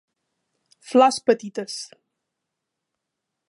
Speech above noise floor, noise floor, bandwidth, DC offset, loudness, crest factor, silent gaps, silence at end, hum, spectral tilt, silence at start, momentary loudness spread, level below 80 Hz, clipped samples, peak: 62 dB; -82 dBFS; 11.5 kHz; under 0.1%; -20 LUFS; 22 dB; none; 1.65 s; none; -3.5 dB/octave; 0.9 s; 16 LU; -80 dBFS; under 0.1%; -4 dBFS